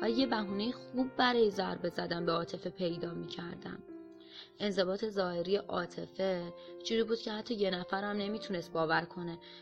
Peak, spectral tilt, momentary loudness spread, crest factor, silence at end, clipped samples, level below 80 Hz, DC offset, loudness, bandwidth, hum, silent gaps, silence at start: -16 dBFS; -5.5 dB/octave; 13 LU; 20 dB; 0 s; under 0.1%; -66 dBFS; under 0.1%; -35 LUFS; 12 kHz; none; none; 0 s